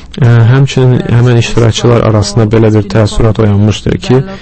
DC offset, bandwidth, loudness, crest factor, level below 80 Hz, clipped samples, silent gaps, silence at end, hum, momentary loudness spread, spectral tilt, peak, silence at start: under 0.1%; 8.8 kHz; -8 LUFS; 6 dB; -24 dBFS; 1%; none; 0 s; none; 3 LU; -7 dB/octave; 0 dBFS; 0 s